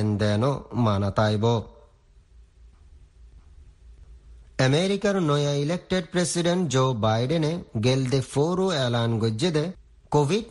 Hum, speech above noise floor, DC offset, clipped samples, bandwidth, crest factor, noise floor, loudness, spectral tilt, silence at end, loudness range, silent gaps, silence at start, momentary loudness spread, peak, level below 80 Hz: none; 32 dB; under 0.1%; under 0.1%; 11.5 kHz; 16 dB; -55 dBFS; -24 LUFS; -6 dB/octave; 0 s; 7 LU; none; 0 s; 4 LU; -8 dBFS; -50 dBFS